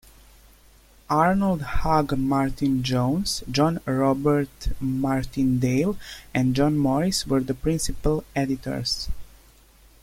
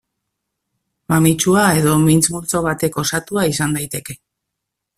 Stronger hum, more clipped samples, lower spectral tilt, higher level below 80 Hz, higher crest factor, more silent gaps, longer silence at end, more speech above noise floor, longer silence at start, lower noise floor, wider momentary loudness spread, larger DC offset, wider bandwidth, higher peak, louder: neither; neither; about the same, -5.5 dB/octave vs -4.5 dB/octave; first, -38 dBFS vs -48 dBFS; about the same, 18 dB vs 16 dB; neither; about the same, 0.75 s vs 0.8 s; second, 31 dB vs 63 dB; about the same, 1.1 s vs 1.1 s; second, -53 dBFS vs -79 dBFS; second, 6 LU vs 11 LU; neither; about the same, 16.5 kHz vs 15.5 kHz; second, -6 dBFS vs -2 dBFS; second, -24 LUFS vs -16 LUFS